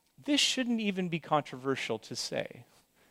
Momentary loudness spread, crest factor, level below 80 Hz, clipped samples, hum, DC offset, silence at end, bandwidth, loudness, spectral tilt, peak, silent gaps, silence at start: 9 LU; 20 dB; -74 dBFS; under 0.1%; none; under 0.1%; 0.45 s; 16 kHz; -31 LUFS; -3.5 dB/octave; -14 dBFS; none; 0.2 s